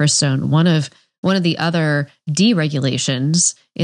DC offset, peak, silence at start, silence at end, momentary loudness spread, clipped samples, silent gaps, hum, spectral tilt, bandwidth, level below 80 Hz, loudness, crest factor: under 0.1%; -4 dBFS; 0 s; 0 s; 6 LU; under 0.1%; 1.18-1.23 s; none; -4.5 dB/octave; 10.5 kHz; -66 dBFS; -17 LUFS; 14 dB